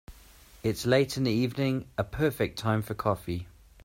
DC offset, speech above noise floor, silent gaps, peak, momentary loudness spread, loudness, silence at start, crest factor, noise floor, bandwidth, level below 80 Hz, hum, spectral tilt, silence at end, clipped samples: under 0.1%; 26 dB; none; -10 dBFS; 9 LU; -29 LUFS; 0.1 s; 20 dB; -54 dBFS; 16 kHz; -52 dBFS; none; -6 dB/octave; 0.35 s; under 0.1%